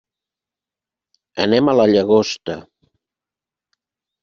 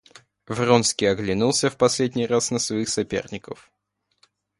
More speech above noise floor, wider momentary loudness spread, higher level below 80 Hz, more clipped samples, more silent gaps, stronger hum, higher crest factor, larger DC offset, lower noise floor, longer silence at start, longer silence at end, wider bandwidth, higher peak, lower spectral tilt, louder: first, 73 dB vs 42 dB; about the same, 17 LU vs 16 LU; about the same, -58 dBFS vs -54 dBFS; neither; neither; second, none vs 50 Hz at -50 dBFS; about the same, 18 dB vs 22 dB; neither; first, -89 dBFS vs -64 dBFS; first, 1.35 s vs 0.5 s; first, 1.6 s vs 1.05 s; second, 7.2 kHz vs 11.5 kHz; about the same, -2 dBFS vs -2 dBFS; about the same, -4.5 dB/octave vs -4 dB/octave; first, -16 LUFS vs -22 LUFS